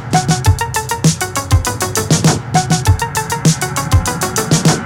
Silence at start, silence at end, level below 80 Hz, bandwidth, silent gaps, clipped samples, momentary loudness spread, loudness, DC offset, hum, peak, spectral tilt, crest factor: 0 s; 0 s; -30 dBFS; 17.5 kHz; none; under 0.1%; 4 LU; -14 LUFS; under 0.1%; none; 0 dBFS; -4.5 dB/octave; 14 dB